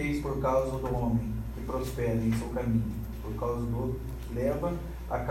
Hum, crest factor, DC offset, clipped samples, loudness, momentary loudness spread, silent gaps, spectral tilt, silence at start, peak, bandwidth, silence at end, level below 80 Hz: none; 16 dB; under 0.1%; under 0.1%; -32 LUFS; 8 LU; none; -8 dB/octave; 0 s; -16 dBFS; 16 kHz; 0 s; -38 dBFS